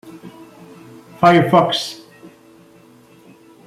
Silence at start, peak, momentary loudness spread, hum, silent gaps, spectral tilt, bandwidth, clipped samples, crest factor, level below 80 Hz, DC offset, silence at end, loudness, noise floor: 0.05 s; -2 dBFS; 26 LU; none; none; -6 dB/octave; 15 kHz; under 0.1%; 18 dB; -60 dBFS; under 0.1%; 1.7 s; -15 LUFS; -47 dBFS